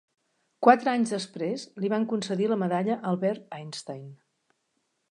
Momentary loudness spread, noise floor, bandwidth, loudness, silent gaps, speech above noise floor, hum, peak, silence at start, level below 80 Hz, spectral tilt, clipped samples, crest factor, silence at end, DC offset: 17 LU; -76 dBFS; 11 kHz; -26 LUFS; none; 50 dB; none; -2 dBFS; 0.6 s; -80 dBFS; -6 dB/octave; under 0.1%; 26 dB; 0.95 s; under 0.1%